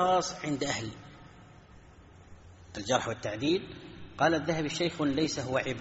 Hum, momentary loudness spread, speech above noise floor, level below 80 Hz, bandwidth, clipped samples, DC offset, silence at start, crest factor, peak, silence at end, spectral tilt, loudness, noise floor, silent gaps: none; 19 LU; 24 dB; -58 dBFS; 8 kHz; under 0.1%; under 0.1%; 0 s; 20 dB; -12 dBFS; 0 s; -3.5 dB/octave; -31 LUFS; -54 dBFS; none